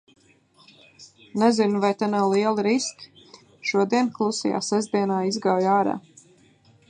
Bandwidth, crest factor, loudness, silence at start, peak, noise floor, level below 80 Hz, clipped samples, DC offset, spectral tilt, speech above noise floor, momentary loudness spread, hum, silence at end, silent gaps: 9.8 kHz; 18 dB; -23 LUFS; 1 s; -6 dBFS; -58 dBFS; -72 dBFS; under 0.1%; under 0.1%; -5 dB/octave; 35 dB; 6 LU; none; 0.9 s; none